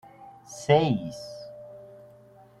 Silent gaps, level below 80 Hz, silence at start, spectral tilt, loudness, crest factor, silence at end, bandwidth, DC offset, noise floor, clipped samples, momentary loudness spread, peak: none; -62 dBFS; 0.2 s; -6 dB/octave; -25 LUFS; 22 dB; 0.75 s; 12.5 kHz; under 0.1%; -53 dBFS; under 0.1%; 27 LU; -8 dBFS